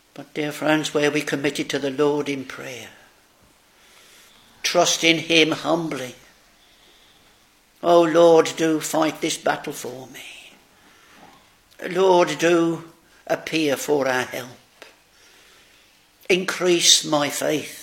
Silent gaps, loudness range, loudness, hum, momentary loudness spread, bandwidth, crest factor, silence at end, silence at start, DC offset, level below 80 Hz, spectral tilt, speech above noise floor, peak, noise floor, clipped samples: none; 6 LU; -20 LUFS; none; 19 LU; 17 kHz; 22 dB; 0 s; 0.2 s; under 0.1%; -66 dBFS; -3 dB/octave; 36 dB; 0 dBFS; -57 dBFS; under 0.1%